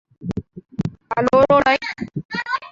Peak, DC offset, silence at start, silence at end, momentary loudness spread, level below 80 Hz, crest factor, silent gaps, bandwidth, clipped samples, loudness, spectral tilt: -2 dBFS; under 0.1%; 0.2 s; 0 s; 16 LU; -48 dBFS; 18 dB; 2.25-2.29 s; 7.6 kHz; under 0.1%; -19 LUFS; -6.5 dB/octave